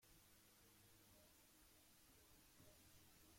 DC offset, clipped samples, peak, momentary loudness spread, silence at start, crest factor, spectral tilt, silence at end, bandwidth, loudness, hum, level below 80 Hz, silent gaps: under 0.1%; under 0.1%; -56 dBFS; 1 LU; 0 s; 14 dB; -2.5 dB/octave; 0 s; 16.5 kHz; -69 LUFS; none; -80 dBFS; none